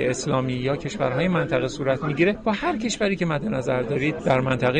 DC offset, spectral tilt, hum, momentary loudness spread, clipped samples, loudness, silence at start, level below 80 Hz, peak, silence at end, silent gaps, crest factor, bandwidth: under 0.1%; -5.5 dB/octave; none; 4 LU; under 0.1%; -23 LUFS; 0 s; -48 dBFS; -8 dBFS; 0 s; none; 14 dB; 9.8 kHz